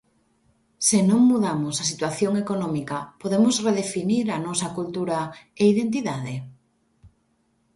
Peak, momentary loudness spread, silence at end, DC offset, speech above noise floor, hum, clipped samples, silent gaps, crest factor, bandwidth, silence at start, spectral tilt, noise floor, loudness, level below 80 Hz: -6 dBFS; 11 LU; 0.7 s; under 0.1%; 45 dB; none; under 0.1%; none; 18 dB; 12 kHz; 0.8 s; -4.5 dB/octave; -67 dBFS; -23 LUFS; -62 dBFS